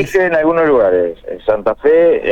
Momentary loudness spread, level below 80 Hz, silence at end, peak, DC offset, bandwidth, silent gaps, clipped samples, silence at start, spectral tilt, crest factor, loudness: 7 LU; -42 dBFS; 0 s; -2 dBFS; under 0.1%; 13 kHz; none; under 0.1%; 0 s; -6.5 dB/octave; 10 dB; -13 LUFS